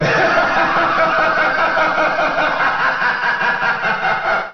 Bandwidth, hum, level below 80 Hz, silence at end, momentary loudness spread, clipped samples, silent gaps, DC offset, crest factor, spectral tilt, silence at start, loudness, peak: 6.8 kHz; none; -44 dBFS; 0 s; 3 LU; under 0.1%; none; 1%; 12 dB; -1.5 dB/octave; 0 s; -15 LUFS; -4 dBFS